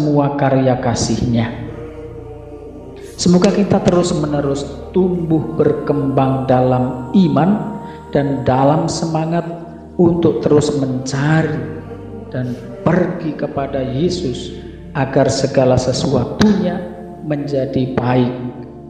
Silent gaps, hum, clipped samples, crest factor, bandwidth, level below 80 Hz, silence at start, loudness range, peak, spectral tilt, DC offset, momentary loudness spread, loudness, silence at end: none; none; under 0.1%; 16 dB; 10 kHz; -40 dBFS; 0 s; 4 LU; 0 dBFS; -6.5 dB/octave; 0.1%; 16 LU; -16 LUFS; 0 s